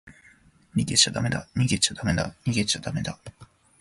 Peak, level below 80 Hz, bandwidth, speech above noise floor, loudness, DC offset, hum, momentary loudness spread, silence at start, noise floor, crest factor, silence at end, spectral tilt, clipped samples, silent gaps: -4 dBFS; -46 dBFS; 11.5 kHz; 31 dB; -24 LUFS; under 0.1%; none; 11 LU; 0.05 s; -57 dBFS; 22 dB; 0.35 s; -3.5 dB/octave; under 0.1%; none